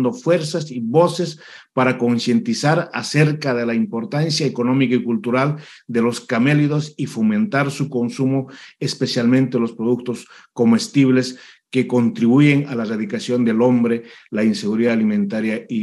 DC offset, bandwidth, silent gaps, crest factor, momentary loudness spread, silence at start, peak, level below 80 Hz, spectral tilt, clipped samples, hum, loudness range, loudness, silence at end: under 0.1%; 12 kHz; none; 16 dB; 9 LU; 0 s; -2 dBFS; -72 dBFS; -6 dB/octave; under 0.1%; none; 2 LU; -19 LUFS; 0 s